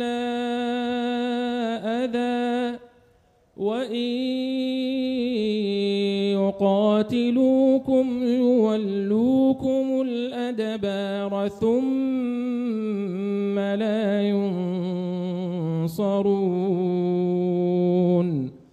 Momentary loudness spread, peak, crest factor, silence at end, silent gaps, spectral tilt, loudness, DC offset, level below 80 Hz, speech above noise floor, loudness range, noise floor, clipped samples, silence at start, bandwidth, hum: 7 LU; -10 dBFS; 14 dB; 0.15 s; none; -7.5 dB/octave; -24 LUFS; under 0.1%; -62 dBFS; 39 dB; 6 LU; -60 dBFS; under 0.1%; 0 s; 12.5 kHz; none